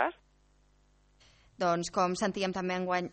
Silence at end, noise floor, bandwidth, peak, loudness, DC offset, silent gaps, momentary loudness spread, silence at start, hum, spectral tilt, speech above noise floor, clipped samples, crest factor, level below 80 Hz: 0 s; -66 dBFS; 8.4 kHz; -14 dBFS; -31 LUFS; under 0.1%; none; 4 LU; 0 s; 50 Hz at -65 dBFS; -4.5 dB/octave; 35 dB; under 0.1%; 20 dB; -64 dBFS